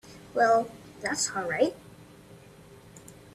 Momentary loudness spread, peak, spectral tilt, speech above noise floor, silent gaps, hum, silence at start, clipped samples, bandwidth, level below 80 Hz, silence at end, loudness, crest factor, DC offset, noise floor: 26 LU; -12 dBFS; -3 dB/octave; 25 dB; none; none; 0.05 s; under 0.1%; 14 kHz; -64 dBFS; 0.05 s; -27 LUFS; 20 dB; under 0.1%; -51 dBFS